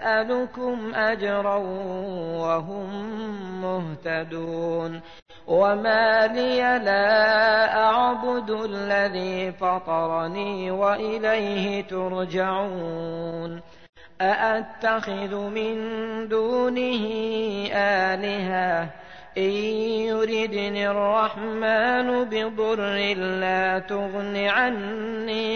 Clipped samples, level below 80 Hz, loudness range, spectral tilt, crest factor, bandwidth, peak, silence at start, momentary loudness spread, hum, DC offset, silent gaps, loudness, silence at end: under 0.1%; -58 dBFS; 7 LU; -5.5 dB/octave; 14 dB; 6.6 kHz; -10 dBFS; 0 s; 11 LU; none; 0.3%; 5.22-5.26 s, 13.89-13.93 s; -24 LUFS; 0 s